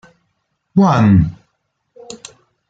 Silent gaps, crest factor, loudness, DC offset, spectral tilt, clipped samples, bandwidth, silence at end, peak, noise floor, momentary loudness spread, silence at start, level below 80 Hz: none; 14 dB; -13 LUFS; under 0.1%; -8 dB/octave; under 0.1%; 8 kHz; 0.55 s; -2 dBFS; -69 dBFS; 23 LU; 0.75 s; -40 dBFS